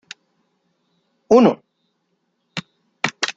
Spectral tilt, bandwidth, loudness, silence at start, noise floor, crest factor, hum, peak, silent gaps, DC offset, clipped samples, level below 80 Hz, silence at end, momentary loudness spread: -4.5 dB/octave; 9 kHz; -17 LUFS; 1.3 s; -70 dBFS; 20 dB; none; -2 dBFS; none; under 0.1%; under 0.1%; -64 dBFS; 0.05 s; 24 LU